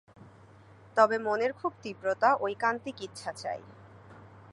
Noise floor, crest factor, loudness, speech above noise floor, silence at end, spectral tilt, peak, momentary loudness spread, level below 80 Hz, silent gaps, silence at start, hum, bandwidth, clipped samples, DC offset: -55 dBFS; 22 dB; -30 LUFS; 25 dB; 0 s; -4.5 dB/octave; -8 dBFS; 14 LU; -68 dBFS; none; 0.25 s; none; 11.5 kHz; under 0.1%; under 0.1%